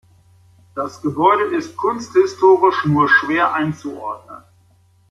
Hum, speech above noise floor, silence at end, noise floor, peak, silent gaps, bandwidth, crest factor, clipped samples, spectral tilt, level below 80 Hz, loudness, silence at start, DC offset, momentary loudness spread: none; 38 dB; 0.75 s; -54 dBFS; -2 dBFS; none; 7.6 kHz; 16 dB; under 0.1%; -6.5 dB/octave; -60 dBFS; -16 LUFS; 0.75 s; under 0.1%; 15 LU